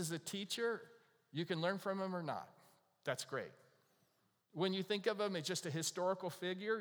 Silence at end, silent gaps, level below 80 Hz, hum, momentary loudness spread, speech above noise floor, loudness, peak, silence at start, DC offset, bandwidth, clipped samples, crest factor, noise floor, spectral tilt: 0 s; none; under -90 dBFS; none; 9 LU; 38 dB; -41 LUFS; -20 dBFS; 0 s; under 0.1%; over 20 kHz; under 0.1%; 22 dB; -79 dBFS; -4 dB/octave